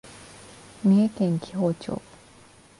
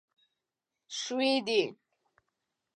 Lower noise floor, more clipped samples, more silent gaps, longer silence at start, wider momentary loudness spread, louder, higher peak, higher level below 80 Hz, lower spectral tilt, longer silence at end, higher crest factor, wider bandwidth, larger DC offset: second, -52 dBFS vs -88 dBFS; neither; neither; second, 0.05 s vs 0.9 s; first, 25 LU vs 10 LU; first, -25 LUFS vs -30 LUFS; about the same, -12 dBFS vs -14 dBFS; first, -60 dBFS vs -88 dBFS; first, -8 dB/octave vs -2.5 dB/octave; second, 0.8 s vs 1.05 s; about the same, 16 dB vs 20 dB; about the same, 11.5 kHz vs 11 kHz; neither